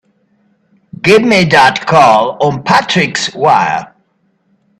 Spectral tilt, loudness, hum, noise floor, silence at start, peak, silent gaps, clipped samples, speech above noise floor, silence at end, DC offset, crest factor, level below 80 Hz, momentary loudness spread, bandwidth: -4.5 dB/octave; -9 LUFS; none; -58 dBFS; 1.05 s; 0 dBFS; none; 0.1%; 49 dB; 0.95 s; under 0.1%; 12 dB; -50 dBFS; 8 LU; 14 kHz